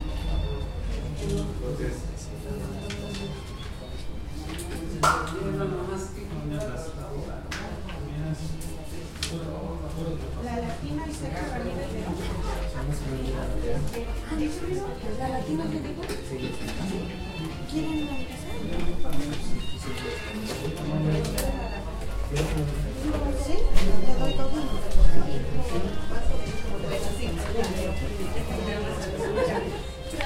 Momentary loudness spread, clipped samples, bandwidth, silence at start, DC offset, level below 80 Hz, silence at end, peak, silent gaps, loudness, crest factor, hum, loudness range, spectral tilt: 8 LU; under 0.1%; 15 kHz; 0 s; under 0.1%; -32 dBFS; 0 s; -4 dBFS; none; -31 LUFS; 20 dB; none; 5 LU; -5.5 dB/octave